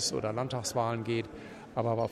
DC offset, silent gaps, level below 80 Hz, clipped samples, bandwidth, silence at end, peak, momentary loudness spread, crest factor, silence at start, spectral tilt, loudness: under 0.1%; none; -62 dBFS; under 0.1%; 14.5 kHz; 0 s; -16 dBFS; 9 LU; 16 dB; 0 s; -4.5 dB/octave; -33 LUFS